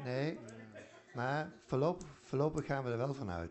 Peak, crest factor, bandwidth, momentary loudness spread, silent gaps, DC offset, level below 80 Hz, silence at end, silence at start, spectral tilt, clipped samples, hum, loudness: -22 dBFS; 16 dB; 8.2 kHz; 16 LU; none; under 0.1%; -62 dBFS; 0 s; 0 s; -7 dB/octave; under 0.1%; none; -38 LUFS